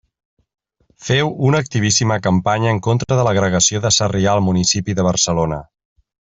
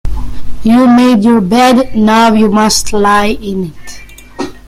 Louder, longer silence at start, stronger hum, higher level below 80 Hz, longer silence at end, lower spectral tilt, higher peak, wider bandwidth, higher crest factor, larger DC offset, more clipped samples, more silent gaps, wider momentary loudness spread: second, -16 LUFS vs -8 LUFS; first, 1 s vs 0.05 s; neither; second, -46 dBFS vs -26 dBFS; first, 0.75 s vs 0.1 s; about the same, -4 dB/octave vs -4.5 dB/octave; about the same, -2 dBFS vs 0 dBFS; second, 8.4 kHz vs 15 kHz; first, 16 dB vs 8 dB; neither; neither; neither; second, 4 LU vs 16 LU